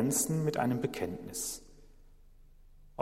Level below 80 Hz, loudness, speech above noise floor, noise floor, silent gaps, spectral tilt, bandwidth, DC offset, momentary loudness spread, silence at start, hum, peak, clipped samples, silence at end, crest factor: -58 dBFS; -33 LUFS; 24 dB; -56 dBFS; none; -4.5 dB/octave; 16 kHz; under 0.1%; 12 LU; 0 s; 50 Hz at -65 dBFS; -16 dBFS; under 0.1%; 0 s; 20 dB